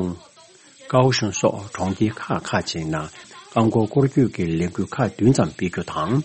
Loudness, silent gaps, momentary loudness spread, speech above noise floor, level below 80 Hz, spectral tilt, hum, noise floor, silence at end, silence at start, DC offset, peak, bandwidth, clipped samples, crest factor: -22 LUFS; none; 9 LU; 29 dB; -50 dBFS; -6 dB/octave; none; -49 dBFS; 0 s; 0 s; under 0.1%; -4 dBFS; 8.8 kHz; under 0.1%; 18 dB